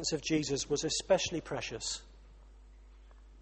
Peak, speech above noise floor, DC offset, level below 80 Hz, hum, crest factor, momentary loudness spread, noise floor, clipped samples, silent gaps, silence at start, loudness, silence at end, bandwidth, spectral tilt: -16 dBFS; 21 dB; under 0.1%; -54 dBFS; none; 20 dB; 8 LU; -55 dBFS; under 0.1%; none; 0 s; -33 LUFS; 0 s; 8.8 kHz; -3 dB/octave